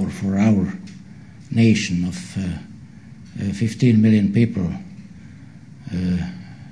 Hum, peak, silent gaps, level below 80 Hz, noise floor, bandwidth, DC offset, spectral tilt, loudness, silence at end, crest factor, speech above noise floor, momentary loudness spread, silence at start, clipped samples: none; -4 dBFS; none; -48 dBFS; -41 dBFS; 11 kHz; 0.3%; -7 dB/octave; -20 LUFS; 0 s; 16 dB; 23 dB; 24 LU; 0 s; under 0.1%